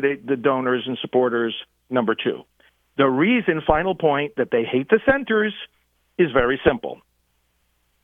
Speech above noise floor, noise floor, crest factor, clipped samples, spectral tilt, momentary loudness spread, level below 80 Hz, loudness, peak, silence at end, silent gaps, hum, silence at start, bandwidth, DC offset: 47 dB; -67 dBFS; 20 dB; under 0.1%; -8.5 dB/octave; 15 LU; -46 dBFS; -21 LUFS; -2 dBFS; 1.1 s; none; 60 Hz at -55 dBFS; 0 s; 3.9 kHz; under 0.1%